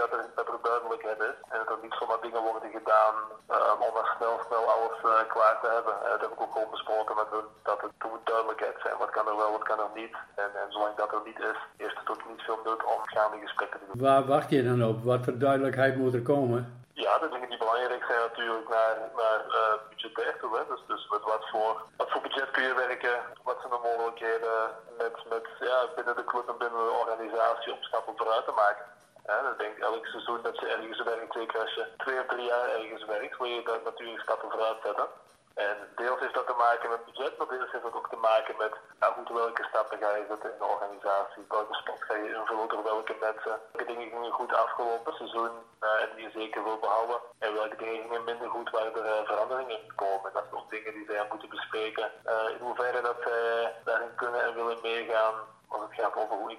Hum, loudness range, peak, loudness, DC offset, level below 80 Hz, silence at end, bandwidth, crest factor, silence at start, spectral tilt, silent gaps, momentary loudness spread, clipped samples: none; 6 LU; -10 dBFS; -30 LUFS; under 0.1%; -78 dBFS; 0 s; 13.5 kHz; 20 dB; 0 s; -6 dB/octave; none; 9 LU; under 0.1%